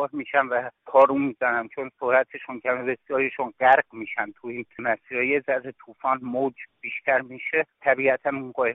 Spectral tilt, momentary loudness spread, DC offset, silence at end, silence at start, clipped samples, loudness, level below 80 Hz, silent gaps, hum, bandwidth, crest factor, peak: 1.5 dB/octave; 12 LU; under 0.1%; 0 s; 0 s; under 0.1%; -24 LUFS; -70 dBFS; none; none; 3.9 kHz; 20 dB; -6 dBFS